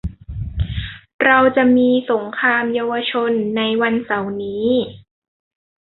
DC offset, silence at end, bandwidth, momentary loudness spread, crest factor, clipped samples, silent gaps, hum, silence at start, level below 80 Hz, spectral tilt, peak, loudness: under 0.1%; 0.95 s; 4.2 kHz; 15 LU; 16 dB; under 0.1%; 1.14-1.19 s; none; 0.05 s; -36 dBFS; -9.5 dB/octave; -2 dBFS; -17 LUFS